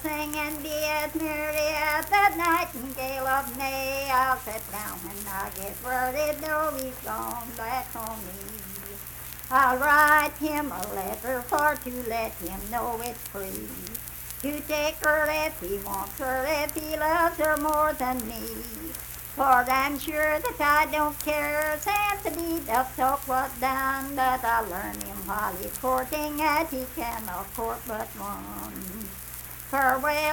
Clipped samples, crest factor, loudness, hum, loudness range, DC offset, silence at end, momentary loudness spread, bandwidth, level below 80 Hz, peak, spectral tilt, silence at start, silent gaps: under 0.1%; 20 dB; -27 LUFS; none; 6 LU; under 0.1%; 0 s; 13 LU; 19 kHz; -48 dBFS; -6 dBFS; -3 dB/octave; 0 s; none